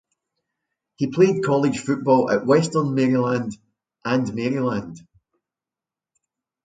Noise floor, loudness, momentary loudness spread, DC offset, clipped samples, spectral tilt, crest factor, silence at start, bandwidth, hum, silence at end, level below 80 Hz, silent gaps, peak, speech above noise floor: -89 dBFS; -21 LUFS; 10 LU; under 0.1%; under 0.1%; -6.5 dB/octave; 18 dB; 1 s; 9.4 kHz; none; 1.65 s; -62 dBFS; none; -4 dBFS; 69 dB